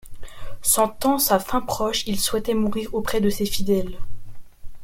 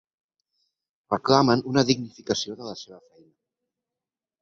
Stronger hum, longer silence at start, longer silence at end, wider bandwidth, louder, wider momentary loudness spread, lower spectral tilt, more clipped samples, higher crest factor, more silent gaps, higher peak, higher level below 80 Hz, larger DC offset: neither; second, 0.05 s vs 1.1 s; second, 0 s vs 1.45 s; first, 16.5 kHz vs 7.6 kHz; about the same, -22 LUFS vs -23 LUFS; second, 10 LU vs 17 LU; second, -3.5 dB/octave vs -5 dB/octave; neither; second, 18 dB vs 24 dB; neither; about the same, -4 dBFS vs -2 dBFS; first, -38 dBFS vs -62 dBFS; neither